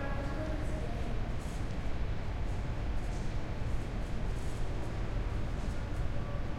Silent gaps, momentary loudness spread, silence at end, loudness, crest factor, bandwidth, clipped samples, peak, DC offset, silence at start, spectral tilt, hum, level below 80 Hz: none; 2 LU; 0 s; -39 LUFS; 14 dB; 11.5 kHz; under 0.1%; -20 dBFS; under 0.1%; 0 s; -6.5 dB/octave; none; -36 dBFS